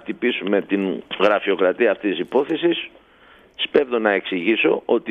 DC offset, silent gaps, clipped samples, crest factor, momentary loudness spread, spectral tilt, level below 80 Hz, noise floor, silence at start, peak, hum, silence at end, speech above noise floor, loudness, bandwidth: under 0.1%; none; under 0.1%; 18 dB; 5 LU; -6.5 dB/octave; -64 dBFS; -51 dBFS; 0.05 s; -2 dBFS; none; 0 s; 31 dB; -20 LUFS; 6.6 kHz